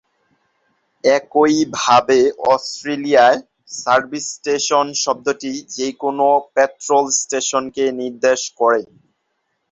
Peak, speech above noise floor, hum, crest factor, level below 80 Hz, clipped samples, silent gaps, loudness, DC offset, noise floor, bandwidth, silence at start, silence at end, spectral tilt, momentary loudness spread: -2 dBFS; 54 dB; none; 16 dB; -62 dBFS; under 0.1%; none; -17 LUFS; under 0.1%; -71 dBFS; 8.2 kHz; 1.05 s; 0.85 s; -2.5 dB/octave; 11 LU